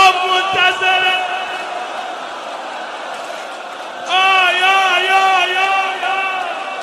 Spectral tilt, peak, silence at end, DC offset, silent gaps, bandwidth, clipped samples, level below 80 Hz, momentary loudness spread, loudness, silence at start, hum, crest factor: -0.5 dB/octave; 0 dBFS; 0 s; under 0.1%; none; 13.5 kHz; under 0.1%; -66 dBFS; 15 LU; -14 LUFS; 0 s; none; 16 dB